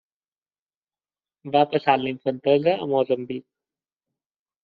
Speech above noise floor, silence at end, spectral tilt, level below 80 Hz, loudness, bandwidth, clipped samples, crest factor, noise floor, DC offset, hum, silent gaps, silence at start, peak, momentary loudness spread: over 68 dB; 1.25 s; -4 dB/octave; -70 dBFS; -22 LUFS; 5 kHz; under 0.1%; 22 dB; under -90 dBFS; under 0.1%; none; none; 1.45 s; -4 dBFS; 13 LU